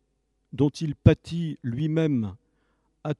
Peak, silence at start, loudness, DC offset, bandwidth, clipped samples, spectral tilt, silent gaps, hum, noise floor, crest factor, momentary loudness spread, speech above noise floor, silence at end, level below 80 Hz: -2 dBFS; 0.55 s; -25 LUFS; under 0.1%; 10.5 kHz; under 0.1%; -8 dB/octave; none; none; -73 dBFS; 24 dB; 14 LU; 49 dB; 0.05 s; -44 dBFS